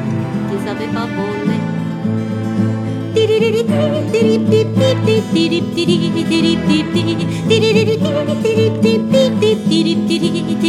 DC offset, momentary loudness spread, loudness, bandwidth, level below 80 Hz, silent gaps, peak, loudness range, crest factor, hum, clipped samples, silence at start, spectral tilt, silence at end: under 0.1%; 7 LU; -15 LUFS; 13.5 kHz; -48 dBFS; none; 0 dBFS; 3 LU; 14 dB; none; under 0.1%; 0 s; -6.5 dB/octave; 0 s